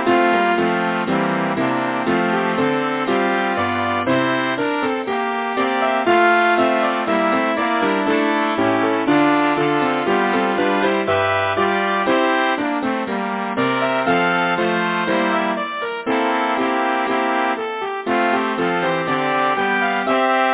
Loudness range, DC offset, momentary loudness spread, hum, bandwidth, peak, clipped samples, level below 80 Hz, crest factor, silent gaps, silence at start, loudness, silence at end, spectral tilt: 2 LU; under 0.1%; 5 LU; none; 4 kHz; 0 dBFS; under 0.1%; -56 dBFS; 18 dB; none; 0 s; -18 LUFS; 0 s; -9 dB/octave